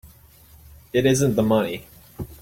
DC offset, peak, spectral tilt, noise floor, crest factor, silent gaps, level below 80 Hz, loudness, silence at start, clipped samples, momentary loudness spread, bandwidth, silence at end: under 0.1%; -6 dBFS; -5.5 dB/octave; -50 dBFS; 18 dB; none; -48 dBFS; -21 LUFS; 0.05 s; under 0.1%; 18 LU; 16.5 kHz; 0.05 s